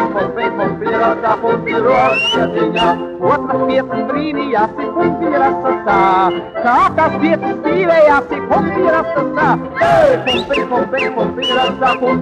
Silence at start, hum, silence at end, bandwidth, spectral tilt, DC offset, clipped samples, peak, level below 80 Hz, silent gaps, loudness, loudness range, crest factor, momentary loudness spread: 0 s; none; 0 s; 10.5 kHz; -6 dB/octave; under 0.1%; under 0.1%; -2 dBFS; -46 dBFS; none; -14 LUFS; 2 LU; 12 dB; 6 LU